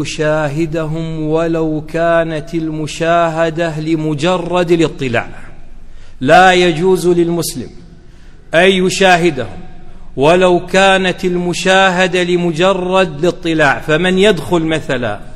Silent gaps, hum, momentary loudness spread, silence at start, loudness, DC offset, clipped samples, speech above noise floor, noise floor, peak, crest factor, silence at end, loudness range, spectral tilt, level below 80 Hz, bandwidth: none; none; 10 LU; 0 s; -13 LUFS; under 0.1%; 0.2%; 22 dB; -35 dBFS; 0 dBFS; 14 dB; 0 s; 4 LU; -5 dB/octave; -32 dBFS; 13.5 kHz